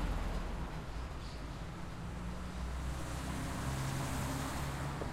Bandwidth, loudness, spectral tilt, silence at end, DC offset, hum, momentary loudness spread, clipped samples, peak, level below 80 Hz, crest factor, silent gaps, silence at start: 16 kHz; -41 LUFS; -5 dB/octave; 0 s; under 0.1%; none; 7 LU; under 0.1%; -26 dBFS; -44 dBFS; 14 dB; none; 0 s